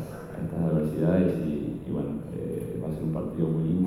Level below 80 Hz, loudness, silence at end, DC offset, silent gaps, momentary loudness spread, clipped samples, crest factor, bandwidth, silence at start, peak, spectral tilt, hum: -48 dBFS; -29 LUFS; 0 s; under 0.1%; none; 9 LU; under 0.1%; 16 dB; 13 kHz; 0 s; -12 dBFS; -9.5 dB/octave; none